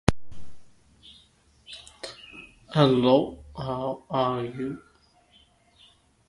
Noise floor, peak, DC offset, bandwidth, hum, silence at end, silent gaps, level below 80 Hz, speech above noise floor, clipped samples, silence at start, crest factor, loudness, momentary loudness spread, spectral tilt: -60 dBFS; 0 dBFS; under 0.1%; 11.5 kHz; none; 1.5 s; none; -48 dBFS; 36 dB; under 0.1%; 0.1 s; 28 dB; -25 LUFS; 23 LU; -6.5 dB/octave